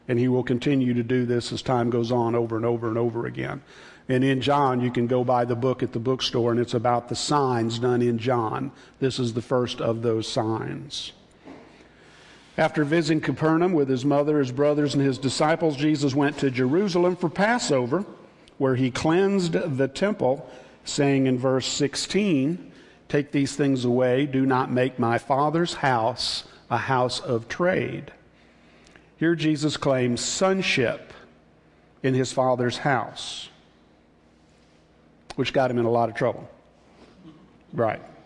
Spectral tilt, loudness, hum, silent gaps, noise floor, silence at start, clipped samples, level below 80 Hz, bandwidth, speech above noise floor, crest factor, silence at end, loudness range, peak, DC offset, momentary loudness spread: -5.5 dB/octave; -24 LUFS; none; none; -57 dBFS; 0.1 s; under 0.1%; -58 dBFS; 11.5 kHz; 34 dB; 18 dB; 0.15 s; 5 LU; -8 dBFS; under 0.1%; 8 LU